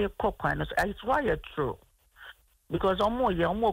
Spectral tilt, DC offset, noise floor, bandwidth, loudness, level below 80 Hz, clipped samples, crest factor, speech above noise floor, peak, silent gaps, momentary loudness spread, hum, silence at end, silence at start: -6.5 dB/octave; under 0.1%; -52 dBFS; 16 kHz; -29 LUFS; -46 dBFS; under 0.1%; 16 dB; 24 dB; -14 dBFS; none; 19 LU; none; 0 s; 0 s